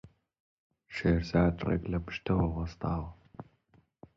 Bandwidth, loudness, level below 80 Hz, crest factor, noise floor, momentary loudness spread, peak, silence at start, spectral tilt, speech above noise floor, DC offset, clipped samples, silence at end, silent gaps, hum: 7.4 kHz; -31 LUFS; -44 dBFS; 20 dB; -67 dBFS; 19 LU; -12 dBFS; 0.05 s; -8.5 dB/octave; 37 dB; under 0.1%; under 0.1%; 0.75 s; 0.40-0.70 s; none